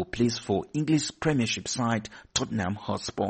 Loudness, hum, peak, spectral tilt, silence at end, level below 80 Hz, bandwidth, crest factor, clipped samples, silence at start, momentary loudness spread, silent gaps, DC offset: -28 LUFS; none; -12 dBFS; -4.5 dB/octave; 0 s; -54 dBFS; 8.8 kHz; 16 dB; under 0.1%; 0 s; 5 LU; none; under 0.1%